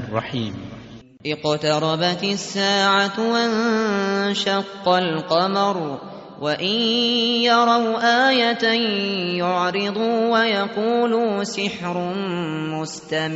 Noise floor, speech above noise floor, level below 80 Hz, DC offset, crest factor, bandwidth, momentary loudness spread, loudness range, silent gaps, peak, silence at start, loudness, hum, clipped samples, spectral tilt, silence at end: -41 dBFS; 21 dB; -62 dBFS; under 0.1%; 16 dB; 8 kHz; 11 LU; 3 LU; none; -4 dBFS; 0 s; -20 LUFS; none; under 0.1%; -2.5 dB/octave; 0 s